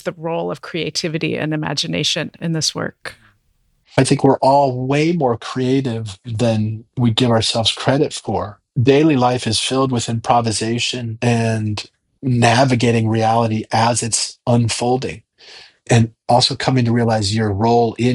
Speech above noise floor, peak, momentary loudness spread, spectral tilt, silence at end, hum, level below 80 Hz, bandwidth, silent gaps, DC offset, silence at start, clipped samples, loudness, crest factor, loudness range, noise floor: 45 dB; 0 dBFS; 10 LU; -5 dB/octave; 0 s; none; -50 dBFS; 11.5 kHz; none; under 0.1%; 0.05 s; under 0.1%; -17 LUFS; 18 dB; 2 LU; -62 dBFS